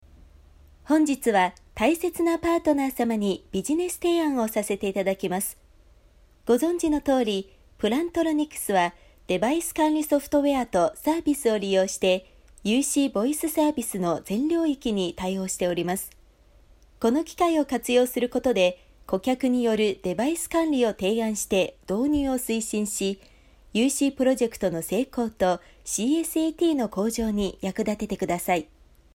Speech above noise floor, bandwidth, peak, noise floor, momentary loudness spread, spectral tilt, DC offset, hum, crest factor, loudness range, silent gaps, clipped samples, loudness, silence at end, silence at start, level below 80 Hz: 32 dB; 16.5 kHz; -8 dBFS; -56 dBFS; 6 LU; -4.5 dB/octave; under 0.1%; none; 16 dB; 2 LU; none; under 0.1%; -25 LUFS; 0.55 s; 0.85 s; -52 dBFS